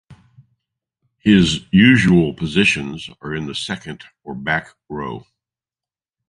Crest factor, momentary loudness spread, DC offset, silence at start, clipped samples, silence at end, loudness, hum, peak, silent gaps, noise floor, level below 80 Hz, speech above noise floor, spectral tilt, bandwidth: 18 dB; 20 LU; under 0.1%; 1.25 s; under 0.1%; 1.1 s; -17 LUFS; none; 0 dBFS; none; under -90 dBFS; -44 dBFS; over 73 dB; -5.5 dB/octave; 11 kHz